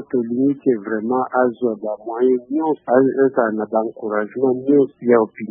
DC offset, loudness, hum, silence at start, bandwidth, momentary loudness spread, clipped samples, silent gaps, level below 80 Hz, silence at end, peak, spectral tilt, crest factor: under 0.1%; -19 LUFS; none; 0 s; 3.5 kHz; 7 LU; under 0.1%; none; -70 dBFS; 0.05 s; -2 dBFS; -13 dB/octave; 18 dB